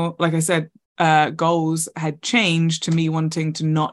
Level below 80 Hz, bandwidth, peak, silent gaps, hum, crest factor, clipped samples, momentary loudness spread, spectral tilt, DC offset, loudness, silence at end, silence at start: -64 dBFS; 12.5 kHz; -2 dBFS; 0.85-0.96 s; none; 18 dB; under 0.1%; 6 LU; -5 dB/octave; under 0.1%; -20 LUFS; 0 s; 0 s